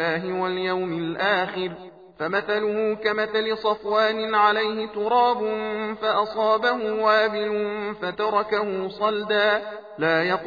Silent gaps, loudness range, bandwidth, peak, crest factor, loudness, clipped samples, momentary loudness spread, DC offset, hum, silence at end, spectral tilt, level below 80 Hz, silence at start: none; 3 LU; 5 kHz; -6 dBFS; 18 dB; -23 LUFS; under 0.1%; 8 LU; under 0.1%; none; 0 s; -6 dB/octave; -64 dBFS; 0 s